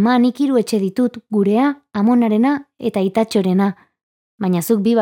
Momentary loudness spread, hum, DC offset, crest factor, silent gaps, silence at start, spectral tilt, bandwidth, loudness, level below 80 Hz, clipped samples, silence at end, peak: 6 LU; none; under 0.1%; 12 dB; 4.03-4.38 s; 0 s; -6.5 dB/octave; 17 kHz; -17 LUFS; -66 dBFS; under 0.1%; 0 s; -4 dBFS